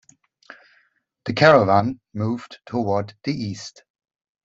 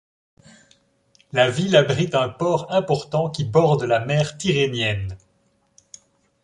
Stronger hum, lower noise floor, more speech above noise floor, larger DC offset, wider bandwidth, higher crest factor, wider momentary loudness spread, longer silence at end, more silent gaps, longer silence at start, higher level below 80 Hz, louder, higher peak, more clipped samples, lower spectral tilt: neither; about the same, -64 dBFS vs -64 dBFS; about the same, 44 dB vs 45 dB; neither; second, 7.8 kHz vs 11 kHz; about the same, 22 dB vs 20 dB; first, 17 LU vs 7 LU; second, 0.75 s vs 1.25 s; neither; about the same, 1.25 s vs 1.35 s; second, -60 dBFS vs -50 dBFS; about the same, -20 LUFS vs -20 LUFS; about the same, -2 dBFS vs -2 dBFS; neither; about the same, -6.5 dB/octave vs -5.5 dB/octave